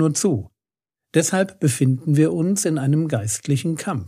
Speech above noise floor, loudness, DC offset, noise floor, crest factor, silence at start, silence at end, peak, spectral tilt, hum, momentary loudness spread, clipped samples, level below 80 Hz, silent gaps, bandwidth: over 70 dB; -20 LUFS; under 0.1%; under -90 dBFS; 18 dB; 0 s; 0 s; -2 dBFS; -5.5 dB/octave; none; 4 LU; under 0.1%; -62 dBFS; none; 15.5 kHz